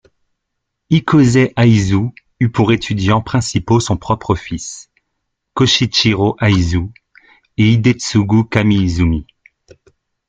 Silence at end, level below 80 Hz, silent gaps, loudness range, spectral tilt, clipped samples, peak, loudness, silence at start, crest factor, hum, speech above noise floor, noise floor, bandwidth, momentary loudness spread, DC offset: 1.05 s; -38 dBFS; none; 3 LU; -5.5 dB/octave; under 0.1%; 0 dBFS; -14 LUFS; 0.9 s; 14 dB; none; 61 dB; -75 dBFS; 9.2 kHz; 12 LU; under 0.1%